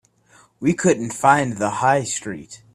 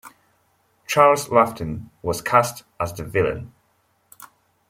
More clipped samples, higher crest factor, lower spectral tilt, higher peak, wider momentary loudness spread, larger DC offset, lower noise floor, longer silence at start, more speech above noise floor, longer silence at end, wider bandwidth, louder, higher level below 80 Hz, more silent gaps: neither; about the same, 20 dB vs 20 dB; about the same, -5 dB/octave vs -4.5 dB/octave; about the same, 0 dBFS vs -2 dBFS; second, 11 LU vs 14 LU; neither; second, -54 dBFS vs -65 dBFS; first, 0.6 s vs 0.05 s; second, 35 dB vs 45 dB; second, 0.2 s vs 0.45 s; second, 14.5 kHz vs 16.5 kHz; about the same, -19 LUFS vs -21 LUFS; second, -58 dBFS vs -52 dBFS; neither